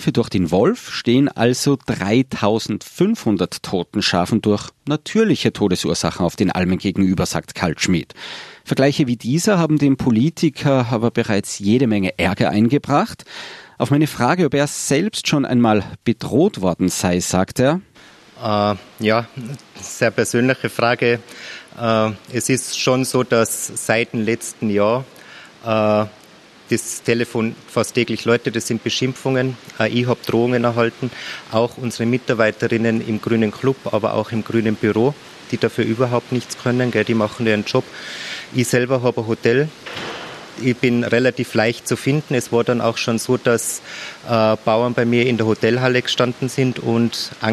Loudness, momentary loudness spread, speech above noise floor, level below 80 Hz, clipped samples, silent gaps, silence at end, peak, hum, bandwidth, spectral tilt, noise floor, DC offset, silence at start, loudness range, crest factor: -19 LUFS; 8 LU; 27 dB; -52 dBFS; under 0.1%; none; 0 s; 0 dBFS; none; 13 kHz; -5 dB/octave; -45 dBFS; under 0.1%; 0 s; 3 LU; 18 dB